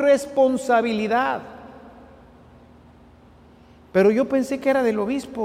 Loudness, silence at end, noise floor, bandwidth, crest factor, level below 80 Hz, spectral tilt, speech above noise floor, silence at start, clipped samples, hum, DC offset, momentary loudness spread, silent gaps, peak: -21 LUFS; 0 s; -50 dBFS; 15 kHz; 16 dB; -56 dBFS; -5.5 dB/octave; 30 dB; 0 s; under 0.1%; none; under 0.1%; 8 LU; none; -6 dBFS